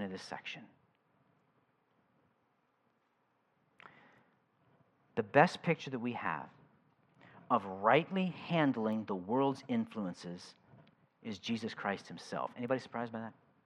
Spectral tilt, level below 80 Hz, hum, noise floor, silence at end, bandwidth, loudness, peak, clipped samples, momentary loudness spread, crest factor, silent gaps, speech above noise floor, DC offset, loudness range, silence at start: -6.5 dB/octave; -86 dBFS; none; -77 dBFS; 0.35 s; 11 kHz; -35 LUFS; -10 dBFS; under 0.1%; 17 LU; 28 dB; none; 42 dB; under 0.1%; 7 LU; 0 s